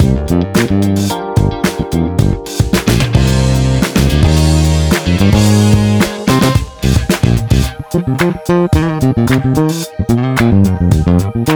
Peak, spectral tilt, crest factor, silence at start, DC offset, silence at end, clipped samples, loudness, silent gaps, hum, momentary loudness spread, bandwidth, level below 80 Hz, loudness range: 0 dBFS; -6 dB/octave; 12 dB; 0 s; 0.4%; 0 s; under 0.1%; -12 LUFS; none; none; 5 LU; over 20 kHz; -20 dBFS; 2 LU